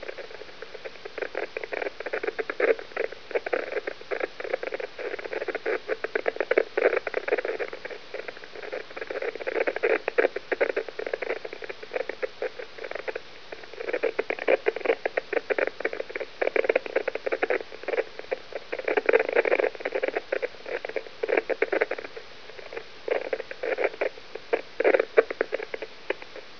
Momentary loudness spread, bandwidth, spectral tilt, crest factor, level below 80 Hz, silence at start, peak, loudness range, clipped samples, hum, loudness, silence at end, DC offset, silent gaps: 14 LU; 5.4 kHz; -4 dB/octave; 26 dB; -68 dBFS; 0 s; -2 dBFS; 4 LU; under 0.1%; none; -29 LUFS; 0 s; 0.6%; none